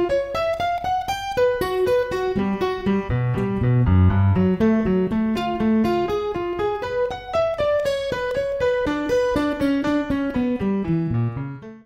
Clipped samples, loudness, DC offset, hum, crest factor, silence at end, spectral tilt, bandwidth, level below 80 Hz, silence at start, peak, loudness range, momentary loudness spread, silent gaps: under 0.1%; -22 LUFS; under 0.1%; none; 14 dB; 0.05 s; -7.5 dB/octave; 15.5 kHz; -40 dBFS; 0 s; -6 dBFS; 3 LU; 6 LU; none